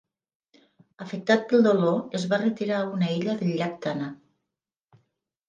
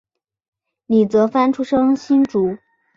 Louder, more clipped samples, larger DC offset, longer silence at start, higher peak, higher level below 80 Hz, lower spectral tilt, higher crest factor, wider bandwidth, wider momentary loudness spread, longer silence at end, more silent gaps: second, -25 LUFS vs -17 LUFS; neither; neither; about the same, 1 s vs 0.9 s; second, -8 dBFS vs -4 dBFS; second, -74 dBFS vs -58 dBFS; about the same, -6.5 dB/octave vs -7.5 dB/octave; first, 20 dB vs 14 dB; first, 9.2 kHz vs 7.4 kHz; first, 13 LU vs 6 LU; first, 1.35 s vs 0.4 s; neither